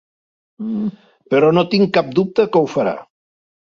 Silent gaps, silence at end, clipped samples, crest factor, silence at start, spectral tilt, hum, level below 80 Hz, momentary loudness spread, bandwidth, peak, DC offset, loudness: none; 0.75 s; under 0.1%; 16 dB; 0.6 s; -7.5 dB/octave; none; -60 dBFS; 12 LU; 7.2 kHz; -2 dBFS; under 0.1%; -17 LUFS